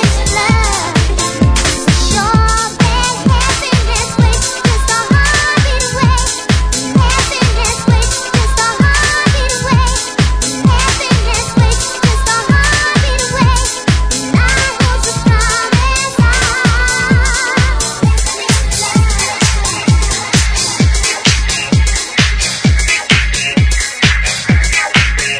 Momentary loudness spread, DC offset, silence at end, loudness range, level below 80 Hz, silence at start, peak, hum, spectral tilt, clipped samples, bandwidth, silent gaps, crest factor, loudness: 3 LU; under 0.1%; 0 s; 1 LU; -16 dBFS; 0 s; 0 dBFS; none; -3.5 dB/octave; under 0.1%; 11 kHz; none; 12 dB; -11 LUFS